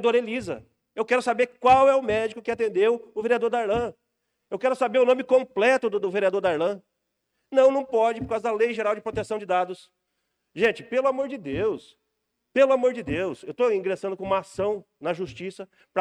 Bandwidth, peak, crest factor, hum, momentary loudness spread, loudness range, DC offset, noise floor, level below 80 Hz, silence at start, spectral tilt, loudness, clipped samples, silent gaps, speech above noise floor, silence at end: 11 kHz; -8 dBFS; 16 dB; none; 12 LU; 4 LU; under 0.1%; -78 dBFS; -56 dBFS; 0 s; -5 dB/octave; -24 LUFS; under 0.1%; none; 55 dB; 0 s